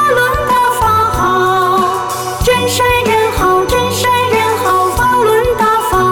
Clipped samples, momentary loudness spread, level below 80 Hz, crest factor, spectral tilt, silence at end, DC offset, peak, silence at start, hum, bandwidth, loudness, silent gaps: under 0.1%; 2 LU; -28 dBFS; 8 dB; -4 dB/octave; 0 s; under 0.1%; -2 dBFS; 0 s; none; 19.5 kHz; -11 LUFS; none